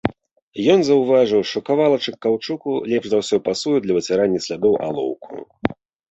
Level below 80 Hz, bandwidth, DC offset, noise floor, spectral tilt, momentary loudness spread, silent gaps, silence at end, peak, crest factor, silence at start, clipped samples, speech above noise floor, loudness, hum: -54 dBFS; 8.2 kHz; under 0.1%; -43 dBFS; -5.5 dB/octave; 11 LU; 0.42-0.52 s; 0.4 s; -2 dBFS; 16 dB; 0.05 s; under 0.1%; 24 dB; -19 LUFS; none